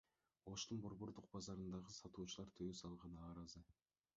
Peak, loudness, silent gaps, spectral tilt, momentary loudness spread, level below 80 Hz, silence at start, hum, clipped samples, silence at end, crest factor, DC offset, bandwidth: -36 dBFS; -53 LUFS; none; -6 dB/octave; 7 LU; -70 dBFS; 0.45 s; none; under 0.1%; 0.45 s; 18 dB; under 0.1%; 7.4 kHz